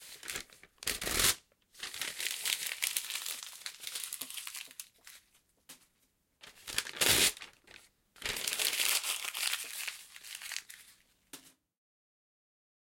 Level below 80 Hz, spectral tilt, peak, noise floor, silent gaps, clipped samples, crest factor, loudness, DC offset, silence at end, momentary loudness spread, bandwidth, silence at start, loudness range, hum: -62 dBFS; 0.5 dB/octave; -10 dBFS; -75 dBFS; none; under 0.1%; 28 dB; -33 LUFS; under 0.1%; 1.3 s; 23 LU; 17 kHz; 0 s; 12 LU; none